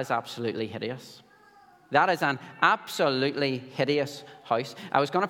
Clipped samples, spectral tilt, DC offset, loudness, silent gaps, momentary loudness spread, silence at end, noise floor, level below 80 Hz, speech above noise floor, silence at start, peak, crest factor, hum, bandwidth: under 0.1%; -5 dB/octave; under 0.1%; -27 LUFS; none; 11 LU; 0 s; -56 dBFS; -78 dBFS; 29 dB; 0 s; -6 dBFS; 22 dB; none; 17.5 kHz